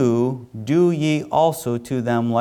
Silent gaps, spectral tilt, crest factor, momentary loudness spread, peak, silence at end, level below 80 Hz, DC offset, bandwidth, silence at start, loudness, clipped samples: none; -7 dB/octave; 12 dB; 6 LU; -6 dBFS; 0 s; -58 dBFS; under 0.1%; 18.5 kHz; 0 s; -20 LUFS; under 0.1%